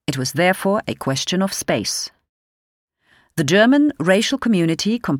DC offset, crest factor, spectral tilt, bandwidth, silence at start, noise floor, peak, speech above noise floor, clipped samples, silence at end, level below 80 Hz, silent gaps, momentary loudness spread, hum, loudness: under 0.1%; 18 dB; -4.5 dB/octave; 17.5 kHz; 0.1 s; under -90 dBFS; -2 dBFS; over 72 dB; under 0.1%; 0 s; -56 dBFS; 2.29-2.88 s; 9 LU; none; -18 LUFS